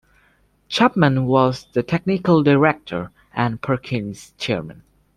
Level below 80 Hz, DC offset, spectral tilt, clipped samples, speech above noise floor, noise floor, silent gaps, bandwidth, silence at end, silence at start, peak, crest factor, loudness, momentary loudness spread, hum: -52 dBFS; under 0.1%; -7 dB/octave; under 0.1%; 41 dB; -59 dBFS; none; 12 kHz; 0.45 s; 0.7 s; -2 dBFS; 18 dB; -19 LUFS; 14 LU; none